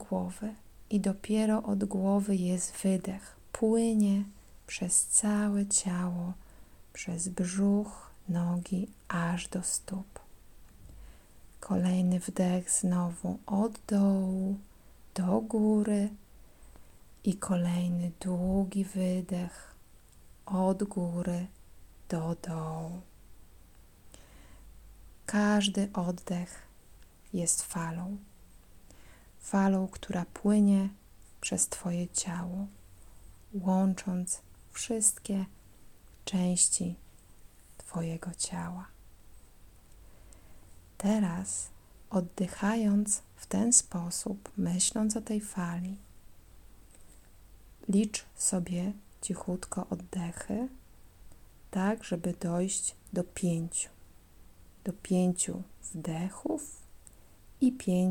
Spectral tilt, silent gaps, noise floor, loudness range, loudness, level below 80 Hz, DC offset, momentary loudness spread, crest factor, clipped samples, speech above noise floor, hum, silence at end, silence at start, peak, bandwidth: -5 dB/octave; none; -56 dBFS; 7 LU; -31 LUFS; -56 dBFS; under 0.1%; 14 LU; 24 dB; under 0.1%; 25 dB; none; 0 s; 0 s; -8 dBFS; 18 kHz